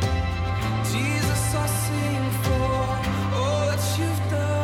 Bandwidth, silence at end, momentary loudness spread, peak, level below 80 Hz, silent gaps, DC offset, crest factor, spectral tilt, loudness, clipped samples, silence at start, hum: 16.5 kHz; 0 s; 2 LU; -10 dBFS; -36 dBFS; none; under 0.1%; 12 dB; -5 dB/octave; -24 LUFS; under 0.1%; 0 s; none